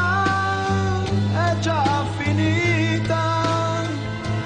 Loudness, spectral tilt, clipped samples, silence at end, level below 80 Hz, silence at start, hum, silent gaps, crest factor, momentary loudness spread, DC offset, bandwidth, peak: -21 LUFS; -6 dB/octave; under 0.1%; 0 s; -44 dBFS; 0 s; none; none; 12 dB; 4 LU; under 0.1%; 9.6 kHz; -8 dBFS